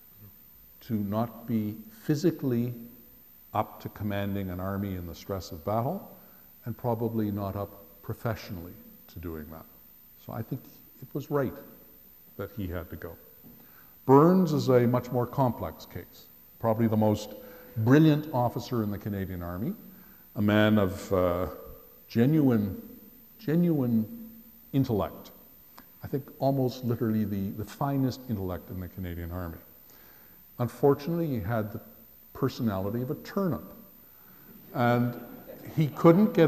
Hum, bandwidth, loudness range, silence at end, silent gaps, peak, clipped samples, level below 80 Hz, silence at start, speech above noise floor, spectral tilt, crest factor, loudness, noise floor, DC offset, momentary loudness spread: none; 15.5 kHz; 11 LU; 0 s; none; -6 dBFS; under 0.1%; -56 dBFS; 0.2 s; 27 dB; -8 dB/octave; 24 dB; -29 LUFS; -54 dBFS; under 0.1%; 22 LU